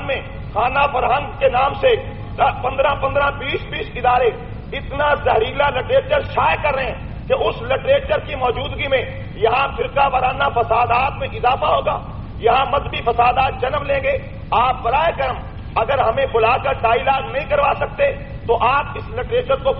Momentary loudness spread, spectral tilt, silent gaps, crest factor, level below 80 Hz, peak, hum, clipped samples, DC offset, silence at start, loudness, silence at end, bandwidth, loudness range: 8 LU; -3 dB/octave; none; 14 dB; -34 dBFS; -4 dBFS; none; under 0.1%; under 0.1%; 0 s; -18 LUFS; 0 s; 5.6 kHz; 1 LU